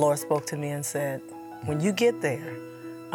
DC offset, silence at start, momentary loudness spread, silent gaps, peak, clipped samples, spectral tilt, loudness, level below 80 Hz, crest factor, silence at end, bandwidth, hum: under 0.1%; 0 s; 16 LU; none; -10 dBFS; under 0.1%; -5 dB/octave; -28 LUFS; -74 dBFS; 18 dB; 0 s; 19 kHz; none